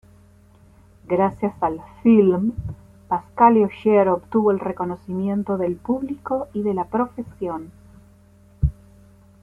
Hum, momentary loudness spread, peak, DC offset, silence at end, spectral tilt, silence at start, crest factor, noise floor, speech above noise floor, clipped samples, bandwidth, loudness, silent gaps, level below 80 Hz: none; 13 LU; -2 dBFS; under 0.1%; 0.7 s; -10 dB/octave; 1.1 s; 20 dB; -51 dBFS; 31 dB; under 0.1%; 3.6 kHz; -21 LUFS; none; -40 dBFS